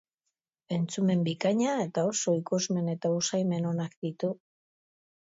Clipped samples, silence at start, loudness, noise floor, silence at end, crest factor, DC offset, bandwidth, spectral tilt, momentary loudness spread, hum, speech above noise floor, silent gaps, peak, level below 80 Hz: under 0.1%; 0.7 s; -29 LUFS; -85 dBFS; 0.9 s; 16 dB; under 0.1%; 8 kHz; -5.5 dB/octave; 7 LU; none; 57 dB; 3.97-4.02 s; -14 dBFS; -76 dBFS